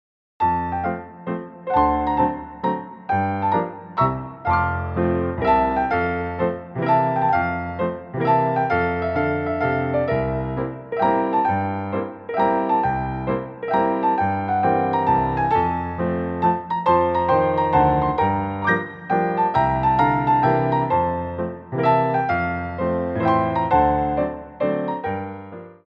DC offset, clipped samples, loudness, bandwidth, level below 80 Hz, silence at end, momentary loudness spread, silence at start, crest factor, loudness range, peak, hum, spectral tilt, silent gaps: under 0.1%; under 0.1%; -21 LUFS; 5.8 kHz; -42 dBFS; 0.15 s; 8 LU; 0.4 s; 16 dB; 3 LU; -4 dBFS; none; -9.5 dB/octave; none